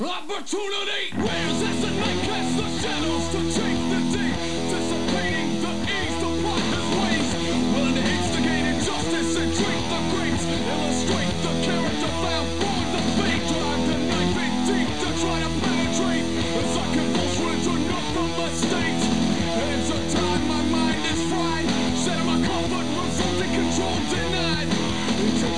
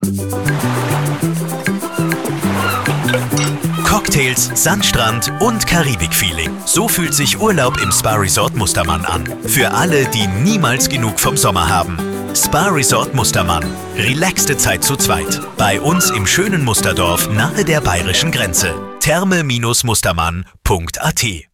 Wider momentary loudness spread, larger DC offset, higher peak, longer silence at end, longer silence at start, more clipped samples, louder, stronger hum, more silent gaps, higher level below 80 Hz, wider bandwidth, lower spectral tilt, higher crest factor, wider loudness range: second, 3 LU vs 6 LU; first, 3% vs under 0.1%; second, -8 dBFS vs -2 dBFS; about the same, 0 s vs 0.1 s; about the same, 0 s vs 0 s; neither; second, -23 LUFS vs -14 LUFS; neither; neither; second, -42 dBFS vs -32 dBFS; second, 11 kHz vs 19.5 kHz; about the same, -4.5 dB/octave vs -3.5 dB/octave; about the same, 16 dB vs 12 dB; about the same, 1 LU vs 2 LU